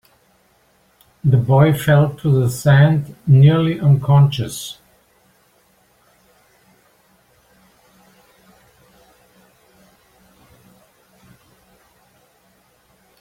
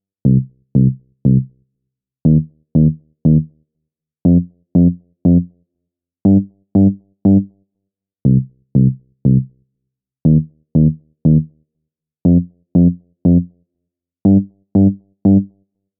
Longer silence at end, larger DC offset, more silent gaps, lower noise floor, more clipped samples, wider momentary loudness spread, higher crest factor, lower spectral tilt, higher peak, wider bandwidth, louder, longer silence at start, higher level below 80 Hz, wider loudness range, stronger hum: first, 8.5 s vs 0.55 s; neither; neither; second, -58 dBFS vs -78 dBFS; neither; first, 13 LU vs 5 LU; about the same, 16 dB vs 16 dB; second, -7.5 dB/octave vs -18.5 dB/octave; about the same, -2 dBFS vs 0 dBFS; first, 15.5 kHz vs 1.2 kHz; about the same, -15 LUFS vs -15 LUFS; first, 1.25 s vs 0.25 s; second, -52 dBFS vs -38 dBFS; first, 8 LU vs 2 LU; neither